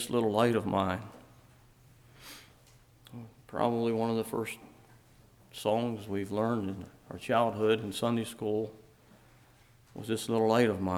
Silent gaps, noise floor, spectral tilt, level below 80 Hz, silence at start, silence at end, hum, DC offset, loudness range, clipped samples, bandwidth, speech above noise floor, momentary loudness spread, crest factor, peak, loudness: none; -61 dBFS; -6 dB/octave; -66 dBFS; 0 s; 0 s; none; under 0.1%; 4 LU; under 0.1%; 19 kHz; 30 dB; 22 LU; 22 dB; -12 dBFS; -31 LUFS